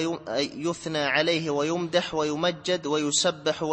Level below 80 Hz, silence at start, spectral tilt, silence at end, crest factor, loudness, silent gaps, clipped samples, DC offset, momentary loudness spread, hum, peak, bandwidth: -62 dBFS; 0 s; -3.5 dB/octave; 0 s; 18 dB; -26 LUFS; none; under 0.1%; under 0.1%; 6 LU; none; -8 dBFS; 8.8 kHz